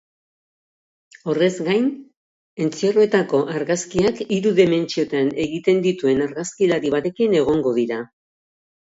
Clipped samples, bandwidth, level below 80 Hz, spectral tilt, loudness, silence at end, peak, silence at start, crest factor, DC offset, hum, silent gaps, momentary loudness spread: under 0.1%; 8 kHz; -56 dBFS; -5.5 dB/octave; -20 LUFS; 0.95 s; -2 dBFS; 1.25 s; 18 dB; under 0.1%; none; 2.17-2.57 s; 9 LU